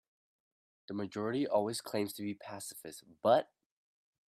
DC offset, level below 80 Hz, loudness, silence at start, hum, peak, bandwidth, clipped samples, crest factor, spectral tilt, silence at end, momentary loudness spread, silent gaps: under 0.1%; -82 dBFS; -35 LUFS; 0.9 s; none; -16 dBFS; 16 kHz; under 0.1%; 22 dB; -5 dB/octave; 0.85 s; 15 LU; none